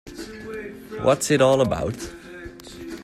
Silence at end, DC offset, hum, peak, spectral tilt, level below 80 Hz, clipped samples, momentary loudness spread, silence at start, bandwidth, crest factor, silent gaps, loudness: 0 s; under 0.1%; none; -4 dBFS; -5 dB/octave; -48 dBFS; under 0.1%; 21 LU; 0.05 s; 14 kHz; 20 dB; none; -20 LUFS